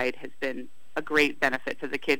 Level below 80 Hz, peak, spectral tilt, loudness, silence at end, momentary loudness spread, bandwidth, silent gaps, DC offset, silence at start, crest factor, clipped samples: -66 dBFS; -6 dBFS; -3.5 dB/octave; -28 LUFS; 0 s; 13 LU; 19 kHz; none; 2%; 0 s; 22 dB; under 0.1%